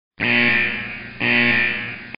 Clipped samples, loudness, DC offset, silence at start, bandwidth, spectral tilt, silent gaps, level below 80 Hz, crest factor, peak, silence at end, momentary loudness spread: under 0.1%; -17 LUFS; 0.9%; 0.1 s; 5.2 kHz; -1.5 dB/octave; none; -50 dBFS; 18 dB; -2 dBFS; 0 s; 11 LU